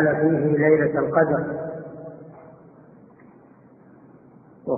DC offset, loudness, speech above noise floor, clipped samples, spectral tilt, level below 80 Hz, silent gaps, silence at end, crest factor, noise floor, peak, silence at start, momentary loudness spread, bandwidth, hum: under 0.1%; -21 LUFS; 31 dB; under 0.1%; -4 dB/octave; -60 dBFS; none; 0 s; 18 dB; -51 dBFS; -6 dBFS; 0 s; 22 LU; 2.6 kHz; none